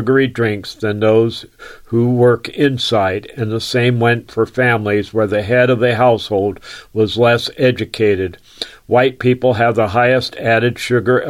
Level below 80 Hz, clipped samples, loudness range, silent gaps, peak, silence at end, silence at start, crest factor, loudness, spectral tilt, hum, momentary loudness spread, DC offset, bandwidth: -50 dBFS; under 0.1%; 1 LU; none; -2 dBFS; 0 s; 0 s; 14 dB; -15 LUFS; -6.5 dB/octave; none; 9 LU; under 0.1%; 15 kHz